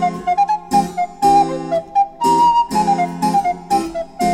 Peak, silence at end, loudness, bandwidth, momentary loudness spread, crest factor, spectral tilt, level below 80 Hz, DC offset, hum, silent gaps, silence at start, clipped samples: -4 dBFS; 0 s; -16 LUFS; 16 kHz; 6 LU; 14 dB; -5 dB/octave; -46 dBFS; under 0.1%; none; none; 0 s; under 0.1%